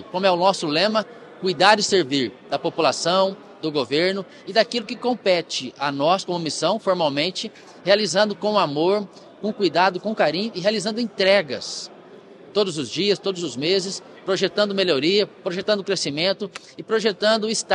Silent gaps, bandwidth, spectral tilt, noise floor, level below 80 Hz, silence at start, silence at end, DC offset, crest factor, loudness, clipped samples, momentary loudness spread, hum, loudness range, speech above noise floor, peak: none; 11 kHz; -3.5 dB/octave; -44 dBFS; -72 dBFS; 0 s; 0 s; under 0.1%; 22 dB; -21 LUFS; under 0.1%; 10 LU; none; 2 LU; 23 dB; 0 dBFS